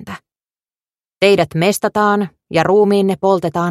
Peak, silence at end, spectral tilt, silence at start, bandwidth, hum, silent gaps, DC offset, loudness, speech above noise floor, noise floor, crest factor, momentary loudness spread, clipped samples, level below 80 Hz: 0 dBFS; 0 s; -5.5 dB/octave; 0.05 s; 15 kHz; none; none; under 0.1%; -15 LUFS; over 76 dB; under -90 dBFS; 16 dB; 7 LU; under 0.1%; -54 dBFS